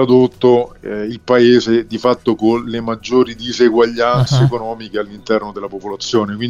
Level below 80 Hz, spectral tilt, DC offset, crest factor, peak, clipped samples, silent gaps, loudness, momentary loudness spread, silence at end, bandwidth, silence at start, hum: -46 dBFS; -6.5 dB/octave; under 0.1%; 14 dB; -2 dBFS; under 0.1%; none; -15 LUFS; 12 LU; 0 s; 7.6 kHz; 0 s; none